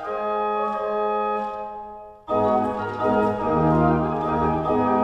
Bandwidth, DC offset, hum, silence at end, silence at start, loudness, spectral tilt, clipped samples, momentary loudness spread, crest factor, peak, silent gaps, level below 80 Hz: 8 kHz; under 0.1%; none; 0 s; 0 s; -23 LUFS; -9 dB/octave; under 0.1%; 12 LU; 16 dB; -6 dBFS; none; -46 dBFS